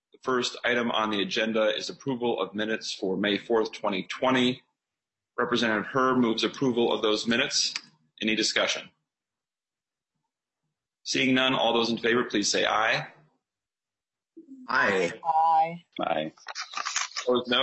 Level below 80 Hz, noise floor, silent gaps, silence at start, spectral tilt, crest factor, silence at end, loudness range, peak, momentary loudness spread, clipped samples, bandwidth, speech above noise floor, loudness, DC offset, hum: -70 dBFS; under -90 dBFS; none; 0.25 s; -3 dB/octave; 20 dB; 0 s; 3 LU; -8 dBFS; 8 LU; under 0.1%; 8.4 kHz; over 64 dB; -26 LUFS; under 0.1%; none